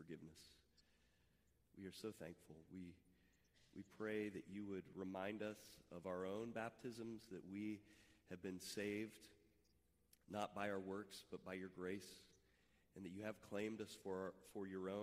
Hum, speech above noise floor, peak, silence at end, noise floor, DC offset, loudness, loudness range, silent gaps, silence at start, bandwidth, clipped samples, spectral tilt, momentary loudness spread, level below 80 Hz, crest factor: none; 30 dB; -30 dBFS; 0 s; -80 dBFS; under 0.1%; -51 LUFS; 5 LU; none; 0 s; 15.5 kHz; under 0.1%; -5.5 dB/octave; 14 LU; -84 dBFS; 22 dB